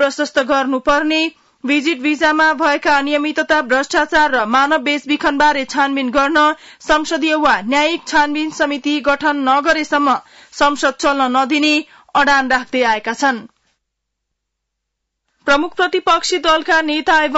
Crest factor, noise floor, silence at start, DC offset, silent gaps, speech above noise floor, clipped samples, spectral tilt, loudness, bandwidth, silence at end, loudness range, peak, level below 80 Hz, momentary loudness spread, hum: 12 dB; -76 dBFS; 0 s; under 0.1%; none; 61 dB; under 0.1%; -2 dB/octave; -15 LUFS; 8 kHz; 0 s; 4 LU; -4 dBFS; -46 dBFS; 5 LU; none